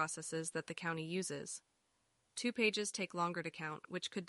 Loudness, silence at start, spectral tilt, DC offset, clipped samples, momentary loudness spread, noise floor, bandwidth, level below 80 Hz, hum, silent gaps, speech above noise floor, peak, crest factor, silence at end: -40 LUFS; 0 s; -3.5 dB/octave; under 0.1%; under 0.1%; 11 LU; -80 dBFS; 11.5 kHz; -84 dBFS; none; none; 39 dB; -22 dBFS; 20 dB; 0 s